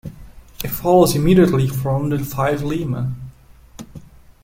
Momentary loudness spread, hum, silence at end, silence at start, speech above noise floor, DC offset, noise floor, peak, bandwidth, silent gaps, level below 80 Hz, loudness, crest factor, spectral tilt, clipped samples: 24 LU; none; 0.45 s; 0.05 s; 28 dB; under 0.1%; -44 dBFS; -2 dBFS; 16.5 kHz; none; -38 dBFS; -18 LUFS; 16 dB; -6.5 dB/octave; under 0.1%